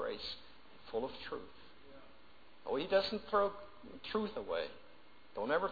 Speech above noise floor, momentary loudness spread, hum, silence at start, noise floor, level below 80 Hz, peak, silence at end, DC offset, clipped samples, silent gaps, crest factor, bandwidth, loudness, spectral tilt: 26 dB; 24 LU; none; 0 s; -63 dBFS; -66 dBFS; -20 dBFS; 0 s; 0.2%; under 0.1%; none; 20 dB; 5 kHz; -38 LUFS; -2 dB/octave